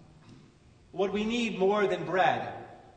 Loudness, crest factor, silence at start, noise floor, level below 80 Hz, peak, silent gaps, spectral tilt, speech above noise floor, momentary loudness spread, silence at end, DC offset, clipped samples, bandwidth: -28 LUFS; 18 dB; 0.3 s; -58 dBFS; -62 dBFS; -12 dBFS; none; -5.5 dB/octave; 30 dB; 14 LU; 0.15 s; under 0.1%; under 0.1%; 9 kHz